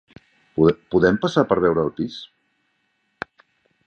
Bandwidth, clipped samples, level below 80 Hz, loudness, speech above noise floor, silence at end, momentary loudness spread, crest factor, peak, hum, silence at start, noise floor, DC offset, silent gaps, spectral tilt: 8.4 kHz; under 0.1%; -50 dBFS; -20 LUFS; 51 dB; 1.6 s; 18 LU; 20 dB; -2 dBFS; none; 0.55 s; -69 dBFS; under 0.1%; none; -7 dB/octave